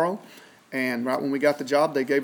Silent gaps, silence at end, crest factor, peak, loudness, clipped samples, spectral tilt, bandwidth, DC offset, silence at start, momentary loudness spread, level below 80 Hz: none; 0 s; 16 dB; -8 dBFS; -25 LUFS; under 0.1%; -5 dB/octave; 19.5 kHz; under 0.1%; 0 s; 8 LU; -84 dBFS